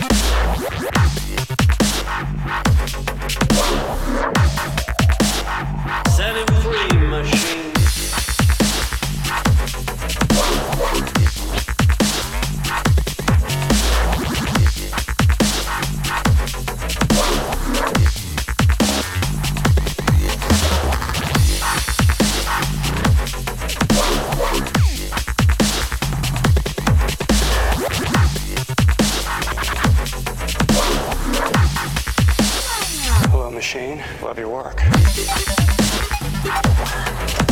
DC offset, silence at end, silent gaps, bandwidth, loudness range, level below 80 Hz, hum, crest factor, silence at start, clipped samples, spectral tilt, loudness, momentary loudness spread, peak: under 0.1%; 0 s; none; 18 kHz; 1 LU; -22 dBFS; none; 16 dB; 0 s; under 0.1%; -4.5 dB/octave; -18 LUFS; 7 LU; -2 dBFS